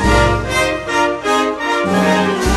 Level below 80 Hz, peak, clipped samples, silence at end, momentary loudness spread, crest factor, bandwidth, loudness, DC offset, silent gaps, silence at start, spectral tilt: -26 dBFS; -2 dBFS; under 0.1%; 0 s; 3 LU; 14 dB; 13 kHz; -15 LUFS; under 0.1%; none; 0 s; -4.5 dB/octave